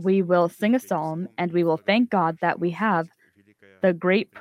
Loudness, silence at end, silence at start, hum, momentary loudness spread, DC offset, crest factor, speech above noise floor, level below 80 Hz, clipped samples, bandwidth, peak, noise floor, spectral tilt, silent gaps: -23 LUFS; 0 s; 0 s; none; 7 LU; under 0.1%; 16 dB; 35 dB; -72 dBFS; under 0.1%; 16 kHz; -6 dBFS; -58 dBFS; -7 dB/octave; none